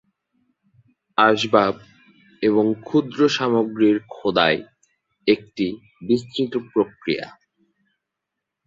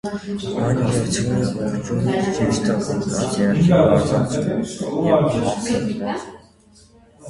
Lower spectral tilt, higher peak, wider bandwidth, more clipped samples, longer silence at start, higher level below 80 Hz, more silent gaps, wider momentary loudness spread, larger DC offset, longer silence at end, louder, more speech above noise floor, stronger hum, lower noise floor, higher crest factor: about the same, -5.5 dB/octave vs -6 dB/octave; about the same, -2 dBFS vs -2 dBFS; second, 7.8 kHz vs 11.5 kHz; neither; first, 1.2 s vs 0.05 s; second, -62 dBFS vs -44 dBFS; neither; about the same, 9 LU vs 10 LU; neither; first, 1.4 s vs 0 s; about the same, -21 LUFS vs -20 LUFS; first, 63 dB vs 31 dB; neither; first, -82 dBFS vs -50 dBFS; about the same, 20 dB vs 18 dB